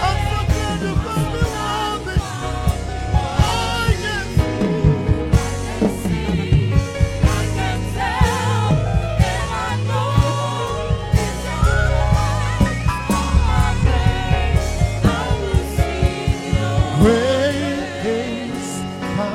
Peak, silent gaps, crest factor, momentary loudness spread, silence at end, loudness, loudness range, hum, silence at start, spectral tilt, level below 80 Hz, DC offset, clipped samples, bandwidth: -2 dBFS; none; 16 dB; 5 LU; 0 s; -19 LUFS; 2 LU; none; 0 s; -6 dB/octave; -24 dBFS; under 0.1%; under 0.1%; 15 kHz